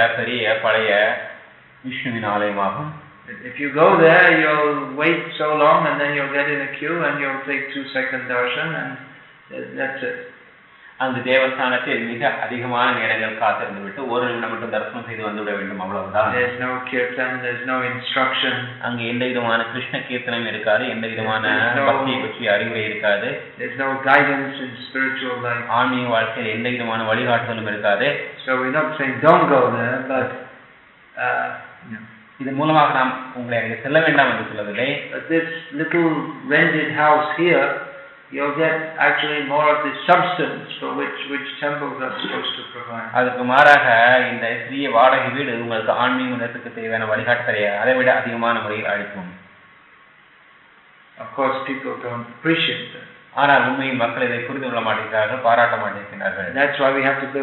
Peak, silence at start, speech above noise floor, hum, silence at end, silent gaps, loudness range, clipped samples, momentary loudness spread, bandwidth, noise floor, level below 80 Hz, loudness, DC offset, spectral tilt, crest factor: 0 dBFS; 0 s; 30 dB; none; 0 s; none; 7 LU; under 0.1%; 13 LU; 7 kHz; -50 dBFS; -68 dBFS; -19 LUFS; under 0.1%; -2.5 dB/octave; 20 dB